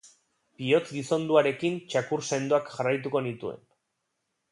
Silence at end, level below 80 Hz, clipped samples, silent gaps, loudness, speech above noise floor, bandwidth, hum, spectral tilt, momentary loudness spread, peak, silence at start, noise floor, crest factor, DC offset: 0.95 s; -74 dBFS; under 0.1%; none; -27 LUFS; 53 dB; 11.5 kHz; none; -5 dB/octave; 12 LU; -8 dBFS; 0.05 s; -80 dBFS; 22 dB; under 0.1%